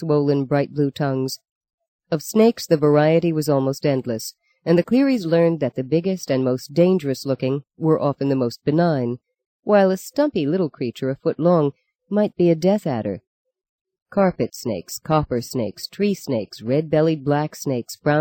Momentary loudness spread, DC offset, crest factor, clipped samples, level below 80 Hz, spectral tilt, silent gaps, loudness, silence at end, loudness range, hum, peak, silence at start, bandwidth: 10 LU; under 0.1%; 16 dB; under 0.1%; -56 dBFS; -7 dB/octave; 1.51-1.61 s, 1.74-1.78 s, 1.88-1.99 s, 9.46-9.63 s, 11.95-11.99 s, 13.27-13.45 s, 13.69-13.85 s, 14.02-14.06 s; -21 LUFS; 0 s; 4 LU; none; -4 dBFS; 0 s; 17 kHz